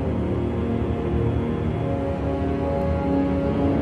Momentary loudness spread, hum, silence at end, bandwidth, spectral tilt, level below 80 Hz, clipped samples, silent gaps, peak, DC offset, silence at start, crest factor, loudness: 3 LU; none; 0 s; 8 kHz; -9.5 dB/octave; -32 dBFS; under 0.1%; none; -10 dBFS; 0.1%; 0 s; 12 dB; -24 LUFS